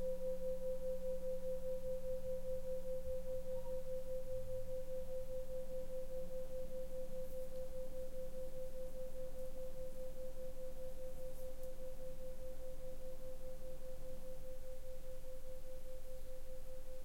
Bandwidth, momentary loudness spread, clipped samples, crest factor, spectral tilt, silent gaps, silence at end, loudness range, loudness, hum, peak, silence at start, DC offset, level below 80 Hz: 16 kHz; 10 LU; under 0.1%; 10 dB; -6 dB/octave; none; 0 s; 8 LU; -49 LUFS; none; -30 dBFS; 0 s; under 0.1%; -48 dBFS